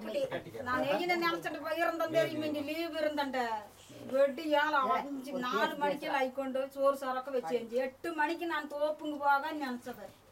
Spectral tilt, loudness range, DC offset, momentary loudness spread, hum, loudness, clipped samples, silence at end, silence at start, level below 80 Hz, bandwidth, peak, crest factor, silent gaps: -4.5 dB/octave; 2 LU; under 0.1%; 8 LU; none; -33 LUFS; under 0.1%; 0.2 s; 0 s; -72 dBFS; 16 kHz; -18 dBFS; 16 dB; none